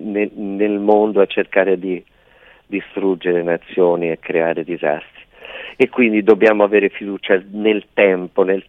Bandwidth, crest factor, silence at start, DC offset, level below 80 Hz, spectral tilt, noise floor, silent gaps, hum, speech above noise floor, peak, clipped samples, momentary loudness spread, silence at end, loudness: 4.1 kHz; 16 dB; 0 s; under 0.1%; -60 dBFS; -8 dB/octave; -49 dBFS; none; none; 33 dB; 0 dBFS; under 0.1%; 13 LU; 0.05 s; -17 LUFS